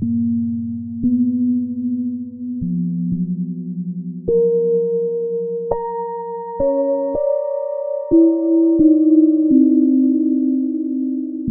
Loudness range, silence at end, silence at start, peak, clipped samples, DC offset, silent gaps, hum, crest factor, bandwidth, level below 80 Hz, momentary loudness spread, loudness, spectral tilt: 7 LU; 0 s; 0 s; -2 dBFS; under 0.1%; under 0.1%; none; none; 14 dB; 2 kHz; -48 dBFS; 12 LU; -18 LUFS; -15.5 dB/octave